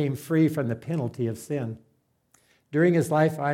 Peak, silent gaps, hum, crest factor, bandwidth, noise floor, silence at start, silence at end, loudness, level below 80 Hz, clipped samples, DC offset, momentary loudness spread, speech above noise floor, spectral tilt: -10 dBFS; none; none; 16 dB; 16 kHz; -66 dBFS; 0 s; 0 s; -25 LUFS; -66 dBFS; under 0.1%; under 0.1%; 10 LU; 41 dB; -7.5 dB/octave